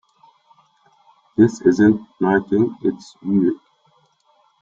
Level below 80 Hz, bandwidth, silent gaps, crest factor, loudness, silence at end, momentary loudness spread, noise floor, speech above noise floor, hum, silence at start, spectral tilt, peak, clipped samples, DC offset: -60 dBFS; 7.6 kHz; none; 18 dB; -18 LUFS; 1.05 s; 11 LU; -60 dBFS; 43 dB; none; 1.4 s; -8 dB/octave; -2 dBFS; under 0.1%; under 0.1%